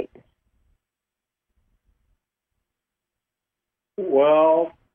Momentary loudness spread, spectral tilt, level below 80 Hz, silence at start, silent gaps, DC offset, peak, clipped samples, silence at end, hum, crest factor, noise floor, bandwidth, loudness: 21 LU; -9 dB/octave; -70 dBFS; 0 s; none; under 0.1%; -8 dBFS; under 0.1%; 0.25 s; none; 18 dB; -87 dBFS; 3.6 kHz; -18 LUFS